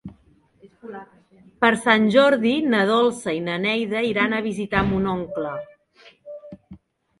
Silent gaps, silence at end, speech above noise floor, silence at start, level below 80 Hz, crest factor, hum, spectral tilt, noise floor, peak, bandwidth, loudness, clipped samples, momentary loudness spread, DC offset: none; 0.45 s; 37 dB; 0.05 s; -50 dBFS; 20 dB; none; -5.5 dB/octave; -58 dBFS; -2 dBFS; 11.5 kHz; -20 LUFS; under 0.1%; 23 LU; under 0.1%